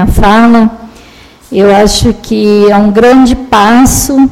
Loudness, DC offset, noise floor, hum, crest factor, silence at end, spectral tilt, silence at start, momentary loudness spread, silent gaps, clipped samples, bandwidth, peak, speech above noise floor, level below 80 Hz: -6 LUFS; under 0.1%; -35 dBFS; none; 6 dB; 0 s; -5 dB/octave; 0 s; 6 LU; none; 3%; 16.5 kHz; 0 dBFS; 30 dB; -20 dBFS